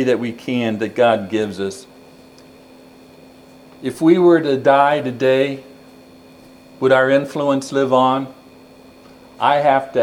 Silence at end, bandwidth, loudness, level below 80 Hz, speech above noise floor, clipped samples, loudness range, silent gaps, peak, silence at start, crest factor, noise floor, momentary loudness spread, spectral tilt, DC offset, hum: 0 s; 13 kHz; -16 LUFS; -64 dBFS; 28 dB; under 0.1%; 6 LU; none; 0 dBFS; 0 s; 18 dB; -44 dBFS; 13 LU; -6 dB/octave; under 0.1%; none